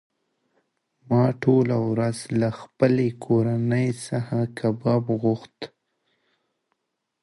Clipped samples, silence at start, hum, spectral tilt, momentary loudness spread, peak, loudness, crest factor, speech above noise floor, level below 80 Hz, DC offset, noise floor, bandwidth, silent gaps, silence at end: under 0.1%; 1.1 s; none; -8 dB/octave; 8 LU; -6 dBFS; -23 LUFS; 18 dB; 54 dB; -62 dBFS; under 0.1%; -76 dBFS; 11.5 kHz; none; 1.55 s